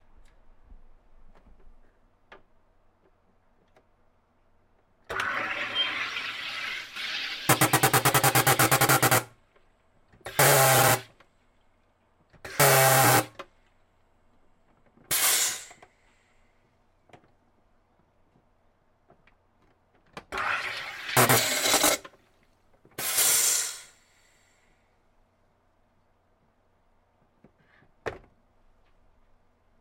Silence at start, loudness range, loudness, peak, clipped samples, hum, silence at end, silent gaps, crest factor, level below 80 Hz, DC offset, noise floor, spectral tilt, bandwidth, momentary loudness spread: 0.7 s; 11 LU; -23 LUFS; -6 dBFS; under 0.1%; none; 1.65 s; none; 24 dB; -60 dBFS; under 0.1%; -67 dBFS; -2.5 dB/octave; 16.5 kHz; 20 LU